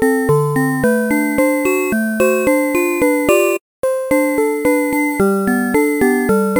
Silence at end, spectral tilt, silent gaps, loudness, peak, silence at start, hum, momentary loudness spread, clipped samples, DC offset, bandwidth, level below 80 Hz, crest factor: 0 s; -6 dB/octave; 3.61-3.83 s; -15 LUFS; 0 dBFS; 0 s; none; 3 LU; under 0.1%; under 0.1%; over 20 kHz; -46 dBFS; 14 dB